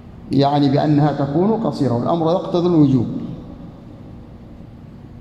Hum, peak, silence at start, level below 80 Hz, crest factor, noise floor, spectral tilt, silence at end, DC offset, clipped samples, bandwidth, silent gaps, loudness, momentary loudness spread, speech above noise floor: none; -4 dBFS; 0.05 s; -46 dBFS; 16 dB; -38 dBFS; -9 dB/octave; 0 s; under 0.1%; under 0.1%; 8.4 kHz; none; -17 LUFS; 24 LU; 22 dB